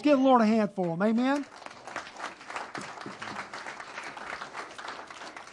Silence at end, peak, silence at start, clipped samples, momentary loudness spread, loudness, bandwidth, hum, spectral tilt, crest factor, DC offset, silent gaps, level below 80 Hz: 0 s; -10 dBFS; 0 s; under 0.1%; 18 LU; -30 LUFS; 11.5 kHz; none; -6 dB/octave; 20 dB; under 0.1%; none; -74 dBFS